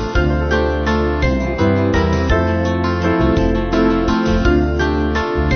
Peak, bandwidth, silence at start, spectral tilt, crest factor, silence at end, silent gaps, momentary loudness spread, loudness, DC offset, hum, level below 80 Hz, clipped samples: -2 dBFS; 6.6 kHz; 0 s; -7 dB/octave; 14 dB; 0 s; none; 2 LU; -16 LUFS; under 0.1%; none; -22 dBFS; under 0.1%